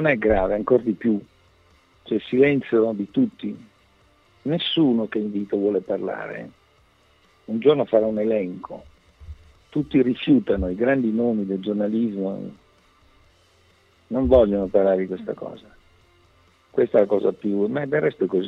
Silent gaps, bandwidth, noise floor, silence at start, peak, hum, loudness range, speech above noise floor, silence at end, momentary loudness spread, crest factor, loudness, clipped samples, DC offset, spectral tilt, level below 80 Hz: none; 5.8 kHz; -59 dBFS; 0 s; -4 dBFS; none; 3 LU; 38 dB; 0 s; 14 LU; 18 dB; -22 LUFS; under 0.1%; under 0.1%; -8.5 dB/octave; -44 dBFS